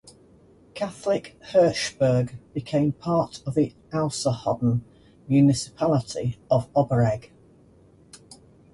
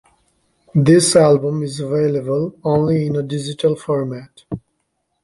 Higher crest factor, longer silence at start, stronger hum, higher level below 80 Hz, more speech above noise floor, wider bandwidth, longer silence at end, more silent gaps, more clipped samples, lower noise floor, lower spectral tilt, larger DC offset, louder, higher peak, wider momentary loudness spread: about the same, 16 dB vs 16 dB; about the same, 0.75 s vs 0.75 s; neither; about the same, -54 dBFS vs -52 dBFS; second, 31 dB vs 54 dB; about the same, 11.5 kHz vs 11.5 kHz; about the same, 0.55 s vs 0.65 s; neither; neither; second, -54 dBFS vs -70 dBFS; about the same, -6.5 dB/octave vs -6 dB/octave; neither; second, -24 LUFS vs -17 LUFS; second, -8 dBFS vs -2 dBFS; second, 10 LU vs 19 LU